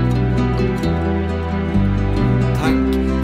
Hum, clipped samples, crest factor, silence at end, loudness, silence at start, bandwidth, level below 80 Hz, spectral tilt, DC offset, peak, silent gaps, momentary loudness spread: none; under 0.1%; 10 dB; 0 s; -18 LUFS; 0 s; 14 kHz; -24 dBFS; -8 dB/octave; under 0.1%; -6 dBFS; none; 3 LU